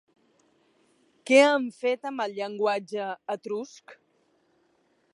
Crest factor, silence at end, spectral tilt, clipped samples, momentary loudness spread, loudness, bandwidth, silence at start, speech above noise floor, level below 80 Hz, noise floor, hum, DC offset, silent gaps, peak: 24 dB; 1.2 s; -3.5 dB/octave; under 0.1%; 16 LU; -26 LUFS; 11 kHz; 1.25 s; 43 dB; -86 dBFS; -68 dBFS; none; under 0.1%; none; -4 dBFS